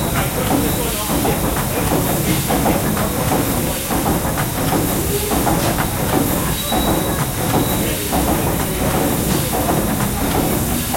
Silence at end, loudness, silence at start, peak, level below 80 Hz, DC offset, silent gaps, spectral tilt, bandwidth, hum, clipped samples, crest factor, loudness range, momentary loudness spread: 0 s; -18 LUFS; 0 s; -2 dBFS; -30 dBFS; under 0.1%; none; -4.5 dB/octave; 16.5 kHz; none; under 0.1%; 16 dB; 0 LU; 2 LU